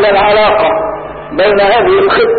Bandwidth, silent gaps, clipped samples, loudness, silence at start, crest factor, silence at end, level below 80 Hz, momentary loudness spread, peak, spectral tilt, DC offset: 4.7 kHz; none; under 0.1%; -9 LUFS; 0 s; 8 dB; 0 s; -36 dBFS; 11 LU; -2 dBFS; -10.5 dB/octave; under 0.1%